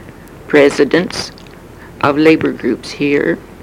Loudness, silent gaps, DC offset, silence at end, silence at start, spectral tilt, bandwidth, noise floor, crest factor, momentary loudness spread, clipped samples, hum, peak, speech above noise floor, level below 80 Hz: -13 LUFS; none; under 0.1%; 0 s; 0 s; -5.5 dB/octave; 15.5 kHz; -35 dBFS; 14 dB; 10 LU; under 0.1%; none; 0 dBFS; 23 dB; -44 dBFS